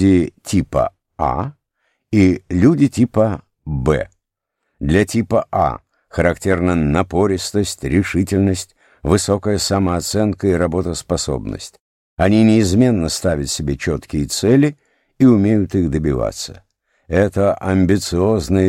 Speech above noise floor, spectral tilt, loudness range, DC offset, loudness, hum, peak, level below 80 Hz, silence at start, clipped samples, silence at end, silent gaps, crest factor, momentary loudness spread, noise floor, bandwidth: 60 dB; -6 dB/octave; 2 LU; under 0.1%; -17 LUFS; none; -2 dBFS; -36 dBFS; 0 s; under 0.1%; 0 s; 11.80-12.17 s; 16 dB; 11 LU; -76 dBFS; 16 kHz